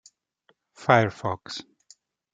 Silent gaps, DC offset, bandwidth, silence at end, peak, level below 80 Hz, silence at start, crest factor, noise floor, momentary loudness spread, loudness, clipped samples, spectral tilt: none; under 0.1%; 9 kHz; 0.7 s; -2 dBFS; -64 dBFS; 0.8 s; 26 dB; -68 dBFS; 17 LU; -24 LUFS; under 0.1%; -6 dB/octave